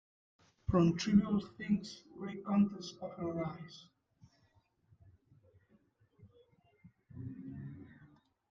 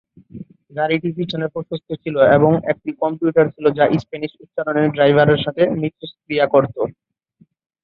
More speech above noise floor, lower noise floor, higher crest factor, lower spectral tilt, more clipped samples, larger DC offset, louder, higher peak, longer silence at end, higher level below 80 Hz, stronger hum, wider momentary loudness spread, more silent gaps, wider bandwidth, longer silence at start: about the same, 39 dB vs 39 dB; first, -73 dBFS vs -56 dBFS; first, 22 dB vs 16 dB; second, -7 dB/octave vs -9 dB/octave; neither; neither; second, -35 LUFS vs -18 LUFS; second, -16 dBFS vs -2 dBFS; second, 0.45 s vs 0.95 s; second, -62 dBFS vs -54 dBFS; neither; first, 21 LU vs 14 LU; neither; first, 7.6 kHz vs 6 kHz; first, 0.7 s vs 0.35 s